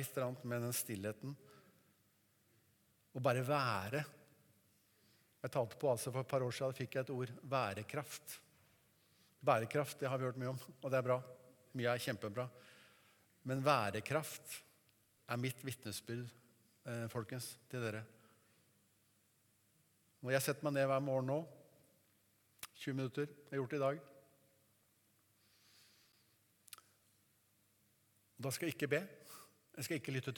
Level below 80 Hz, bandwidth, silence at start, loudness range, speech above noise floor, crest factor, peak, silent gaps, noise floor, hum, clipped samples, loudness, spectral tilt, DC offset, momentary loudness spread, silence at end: -86 dBFS; 19 kHz; 0 s; 7 LU; 36 dB; 26 dB; -16 dBFS; none; -76 dBFS; none; under 0.1%; -41 LUFS; -5 dB/octave; under 0.1%; 17 LU; 0 s